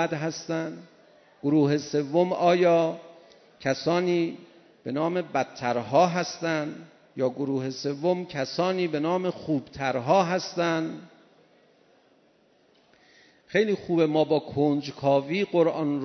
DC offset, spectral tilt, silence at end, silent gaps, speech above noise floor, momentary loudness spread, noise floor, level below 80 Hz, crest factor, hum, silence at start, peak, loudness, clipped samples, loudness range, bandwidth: under 0.1%; -6 dB/octave; 0 s; none; 37 dB; 10 LU; -62 dBFS; -68 dBFS; 18 dB; none; 0 s; -8 dBFS; -26 LUFS; under 0.1%; 4 LU; 6.4 kHz